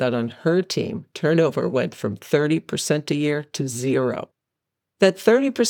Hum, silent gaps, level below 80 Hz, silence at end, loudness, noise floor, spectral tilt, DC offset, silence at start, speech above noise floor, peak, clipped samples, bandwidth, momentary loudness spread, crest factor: none; none; -70 dBFS; 0 s; -22 LUFS; -83 dBFS; -5 dB/octave; under 0.1%; 0 s; 62 dB; -2 dBFS; under 0.1%; 20 kHz; 9 LU; 20 dB